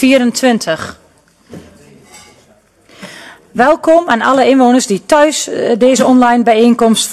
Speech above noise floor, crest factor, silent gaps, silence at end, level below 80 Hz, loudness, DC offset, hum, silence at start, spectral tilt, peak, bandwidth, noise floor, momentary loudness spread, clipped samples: 39 dB; 12 dB; none; 0 s; -50 dBFS; -10 LUFS; under 0.1%; none; 0 s; -3.5 dB/octave; 0 dBFS; 13 kHz; -48 dBFS; 13 LU; under 0.1%